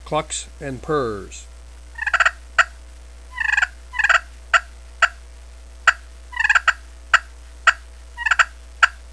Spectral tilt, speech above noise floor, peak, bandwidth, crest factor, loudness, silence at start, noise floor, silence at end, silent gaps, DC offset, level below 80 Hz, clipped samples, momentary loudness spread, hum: -2 dB/octave; 15 dB; 0 dBFS; 11 kHz; 22 dB; -19 LUFS; 0 s; -40 dBFS; 0 s; none; 0.3%; -40 dBFS; under 0.1%; 17 LU; 60 Hz at -40 dBFS